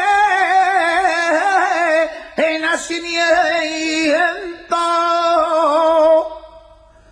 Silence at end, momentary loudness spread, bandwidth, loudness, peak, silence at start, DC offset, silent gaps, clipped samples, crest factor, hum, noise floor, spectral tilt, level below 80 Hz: 0.55 s; 7 LU; 10.5 kHz; -15 LUFS; -2 dBFS; 0 s; under 0.1%; none; under 0.1%; 14 dB; none; -45 dBFS; -1.5 dB/octave; -52 dBFS